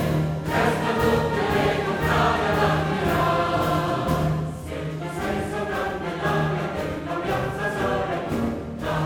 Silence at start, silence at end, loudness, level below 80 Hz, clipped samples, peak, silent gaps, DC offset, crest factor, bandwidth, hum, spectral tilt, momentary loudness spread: 0 s; 0 s; -24 LUFS; -40 dBFS; under 0.1%; -8 dBFS; none; under 0.1%; 16 dB; 18 kHz; none; -6 dB/octave; 7 LU